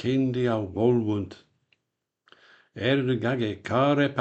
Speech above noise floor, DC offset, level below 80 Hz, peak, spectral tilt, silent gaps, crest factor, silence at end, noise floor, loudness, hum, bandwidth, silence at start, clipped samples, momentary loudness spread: 58 dB; under 0.1%; -62 dBFS; -8 dBFS; -7.5 dB/octave; none; 18 dB; 0 s; -82 dBFS; -25 LUFS; none; 8.2 kHz; 0 s; under 0.1%; 8 LU